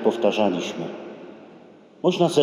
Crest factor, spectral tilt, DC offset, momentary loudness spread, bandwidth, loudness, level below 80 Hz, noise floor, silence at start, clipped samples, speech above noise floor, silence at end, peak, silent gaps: 18 dB; -5.5 dB/octave; under 0.1%; 21 LU; 13.5 kHz; -23 LUFS; -74 dBFS; -48 dBFS; 0 s; under 0.1%; 27 dB; 0 s; -6 dBFS; none